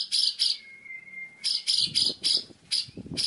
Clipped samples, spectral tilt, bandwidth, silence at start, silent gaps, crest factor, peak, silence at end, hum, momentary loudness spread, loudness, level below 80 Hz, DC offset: under 0.1%; 0 dB/octave; 11.5 kHz; 0 s; none; 18 dB; -12 dBFS; 0 s; none; 18 LU; -25 LUFS; -66 dBFS; under 0.1%